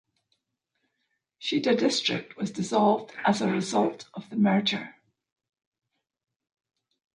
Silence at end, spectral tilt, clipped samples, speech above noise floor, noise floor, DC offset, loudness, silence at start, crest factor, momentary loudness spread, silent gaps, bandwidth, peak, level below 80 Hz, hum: 2.25 s; -5 dB/octave; under 0.1%; 54 dB; -80 dBFS; under 0.1%; -26 LUFS; 1.4 s; 18 dB; 11 LU; none; 10.5 kHz; -10 dBFS; -74 dBFS; none